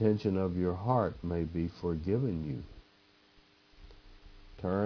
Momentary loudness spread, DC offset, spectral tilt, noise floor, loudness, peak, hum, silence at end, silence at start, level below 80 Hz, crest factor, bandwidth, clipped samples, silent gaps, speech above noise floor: 10 LU; under 0.1%; -10 dB/octave; -64 dBFS; -33 LUFS; -14 dBFS; none; 0 s; 0 s; -52 dBFS; 20 dB; 5.4 kHz; under 0.1%; none; 33 dB